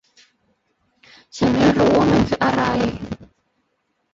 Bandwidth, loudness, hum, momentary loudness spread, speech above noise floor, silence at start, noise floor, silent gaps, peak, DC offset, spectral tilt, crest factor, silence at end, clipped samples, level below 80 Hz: 7.8 kHz; -17 LUFS; none; 18 LU; 54 dB; 1.35 s; -70 dBFS; none; -4 dBFS; under 0.1%; -6.5 dB/octave; 16 dB; 0.9 s; under 0.1%; -42 dBFS